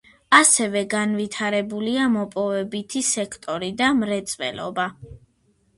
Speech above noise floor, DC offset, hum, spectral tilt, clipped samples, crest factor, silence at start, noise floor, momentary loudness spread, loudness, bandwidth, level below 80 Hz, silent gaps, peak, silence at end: 42 dB; under 0.1%; none; -2.5 dB/octave; under 0.1%; 22 dB; 0.3 s; -64 dBFS; 12 LU; -21 LUFS; 11.5 kHz; -58 dBFS; none; 0 dBFS; 0.6 s